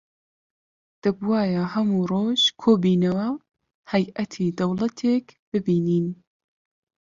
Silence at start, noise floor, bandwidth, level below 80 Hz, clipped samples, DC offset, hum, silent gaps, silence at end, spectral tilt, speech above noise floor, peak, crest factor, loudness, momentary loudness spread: 1.05 s; under -90 dBFS; 7.4 kHz; -62 dBFS; under 0.1%; under 0.1%; none; 3.74-3.83 s, 5.39-5.52 s; 1.05 s; -6.5 dB/octave; over 68 dB; -6 dBFS; 18 dB; -23 LUFS; 9 LU